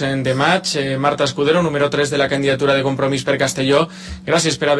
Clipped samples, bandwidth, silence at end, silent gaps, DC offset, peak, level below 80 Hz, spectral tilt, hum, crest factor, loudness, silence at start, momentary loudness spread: under 0.1%; 11 kHz; 0 s; none; under 0.1%; -2 dBFS; -46 dBFS; -4.5 dB/octave; none; 14 dB; -17 LUFS; 0 s; 3 LU